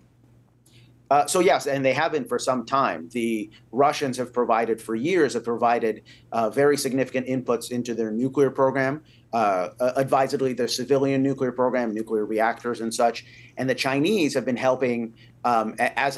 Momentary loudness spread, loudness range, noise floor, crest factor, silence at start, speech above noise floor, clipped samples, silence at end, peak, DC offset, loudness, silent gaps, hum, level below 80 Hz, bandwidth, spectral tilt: 7 LU; 1 LU; -56 dBFS; 16 dB; 1.1 s; 33 dB; under 0.1%; 0 s; -8 dBFS; under 0.1%; -24 LUFS; none; none; -66 dBFS; 12.5 kHz; -5 dB/octave